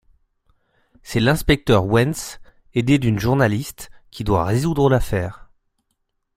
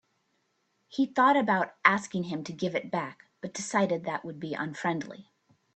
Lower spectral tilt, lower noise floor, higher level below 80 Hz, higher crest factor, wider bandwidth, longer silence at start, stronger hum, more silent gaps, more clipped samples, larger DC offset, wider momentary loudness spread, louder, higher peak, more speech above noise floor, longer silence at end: about the same, -6 dB/octave vs -5 dB/octave; about the same, -72 dBFS vs -75 dBFS; first, -36 dBFS vs -74 dBFS; about the same, 20 dB vs 24 dB; first, 16 kHz vs 9 kHz; first, 1.05 s vs 0.9 s; neither; neither; neither; neither; about the same, 14 LU vs 15 LU; first, -19 LUFS vs -29 LUFS; first, -2 dBFS vs -6 dBFS; first, 54 dB vs 46 dB; first, 1 s vs 0.55 s